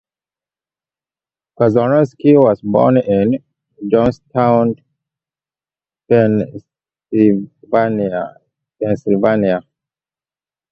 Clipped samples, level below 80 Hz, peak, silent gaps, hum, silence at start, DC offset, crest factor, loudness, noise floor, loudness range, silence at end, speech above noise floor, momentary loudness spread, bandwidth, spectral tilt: under 0.1%; -50 dBFS; 0 dBFS; none; none; 1.6 s; under 0.1%; 16 dB; -15 LUFS; under -90 dBFS; 4 LU; 1.1 s; over 77 dB; 11 LU; 7 kHz; -9.5 dB/octave